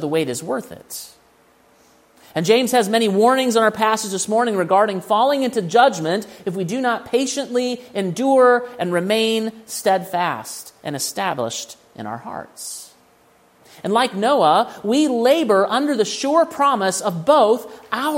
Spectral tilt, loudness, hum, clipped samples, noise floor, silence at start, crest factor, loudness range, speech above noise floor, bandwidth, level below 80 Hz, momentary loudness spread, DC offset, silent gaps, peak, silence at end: -4 dB/octave; -18 LUFS; none; under 0.1%; -55 dBFS; 0 s; 18 dB; 7 LU; 36 dB; 16.5 kHz; -68 dBFS; 16 LU; under 0.1%; none; -2 dBFS; 0 s